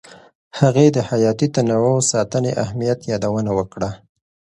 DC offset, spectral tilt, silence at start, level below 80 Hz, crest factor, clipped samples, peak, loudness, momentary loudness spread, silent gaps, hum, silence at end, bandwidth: under 0.1%; -6 dB/octave; 0.1 s; -50 dBFS; 18 dB; under 0.1%; 0 dBFS; -18 LUFS; 9 LU; 0.35-0.51 s; none; 0.55 s; 11.5 kHz